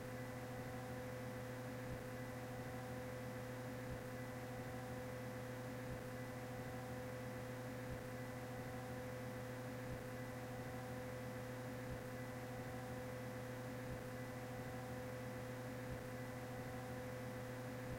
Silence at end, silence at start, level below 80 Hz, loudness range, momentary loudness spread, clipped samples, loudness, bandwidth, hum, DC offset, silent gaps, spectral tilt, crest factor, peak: 0 s; 0 s; -64 dBFS; 0 LU; 1 LU; under 0.1%; -49 LUFS; 16.5 kHz; none; under 0.1%; none; -6 dB/octave; 12 dB; -36 dBFS